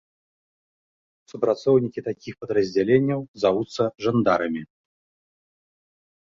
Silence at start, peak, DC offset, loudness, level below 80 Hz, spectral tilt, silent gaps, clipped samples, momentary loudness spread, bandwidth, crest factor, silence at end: 1.35 s; -6 dBFS; under 0.1%; -23 LUFS; -62 dBFS; -7 dB/octave; 3.28-3.34 s; under 0.1%; 12 LU; 7.6 kHz; 20 dB; 1.65 s